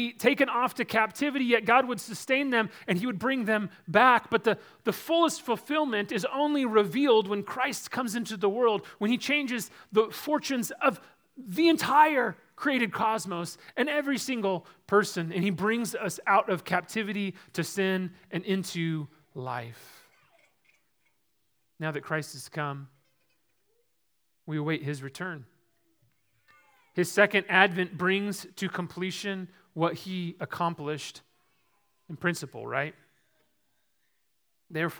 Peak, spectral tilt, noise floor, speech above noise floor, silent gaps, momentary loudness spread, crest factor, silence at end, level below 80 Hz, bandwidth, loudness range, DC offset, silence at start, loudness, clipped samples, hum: -4 dBFS; -4.5 dB/octave; -77 dBFS; 49 dB; none; 13 LU; 26 dB; 0 s; -76 dBFS; over 20 kHz; 12 LU; under 0.1%; 0 s; -28 LUFS; under 0.1%; none